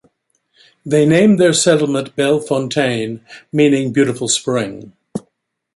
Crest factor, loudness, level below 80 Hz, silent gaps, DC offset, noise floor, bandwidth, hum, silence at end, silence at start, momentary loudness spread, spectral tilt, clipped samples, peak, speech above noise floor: 14 dB; -15 LUFS; -56 dBFS; none; under 0.1%; -67 dBFS; 11.5 kHz; none; 0.55 s; 0.85 s; 19 LU; -4.5 dB/octave; under 0.1%; -2 dBFS; 52 dB